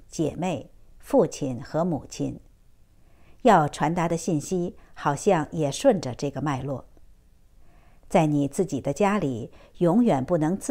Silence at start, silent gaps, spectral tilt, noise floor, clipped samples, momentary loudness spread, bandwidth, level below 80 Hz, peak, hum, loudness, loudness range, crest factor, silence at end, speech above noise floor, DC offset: 0.15 s; none; -6.5 dB/octave; -54 dBFS; under 0.1%; 12 LU; 16 kHz; -52 dBFS; -6 dBFS; none; -25 LUFS; 4 LU; 20 dB; 0 s; 30 dB; under 0.1%